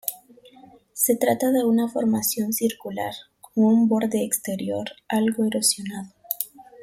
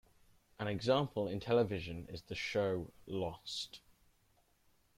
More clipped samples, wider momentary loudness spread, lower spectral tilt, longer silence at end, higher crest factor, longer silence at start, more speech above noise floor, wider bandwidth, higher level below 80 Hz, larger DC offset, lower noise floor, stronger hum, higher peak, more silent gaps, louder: neither; about the same, 12 LU vs 12 LU; second, -4 dB/octave vs -5.5 dB/octave; second, 0 s vs 1.2 s; about the same, 20 dB vs 20 dB; second, 0.05 s vs 0.6 s; second, 28 dB vs 36 dB; about the same, 16.5 kHz vs 15.5 kHz; about the same, -66 dBFS vs -64 dBFS; neither; second, -50 dBFS vs -73 dBFS; neither; first, -4 dBFS vs -18 dBFS; neither; first, -23 LUFS vs -38 LUFS